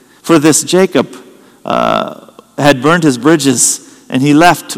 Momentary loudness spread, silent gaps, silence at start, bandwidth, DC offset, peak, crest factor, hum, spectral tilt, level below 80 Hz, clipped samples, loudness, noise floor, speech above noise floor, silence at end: 12 LU; none; 0.25 s; over 20 kHz; under 0.1%; 0 dBFS; 12 dB; none; -4 dB/octave; -48 dBFS; 2%; -10 LUFS; -32 dBFS; 23 dB; 0 s